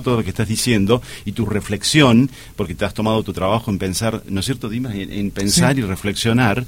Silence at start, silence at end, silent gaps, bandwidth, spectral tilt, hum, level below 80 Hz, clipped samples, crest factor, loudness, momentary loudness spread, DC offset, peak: 0 s; 0 s; none; 16.5 kHz; -5 dB/octave; none; -40 dBFS; under 0.1%; 18 dB; -18 LUFS; 11 LU; 0.3%; 0 dBFS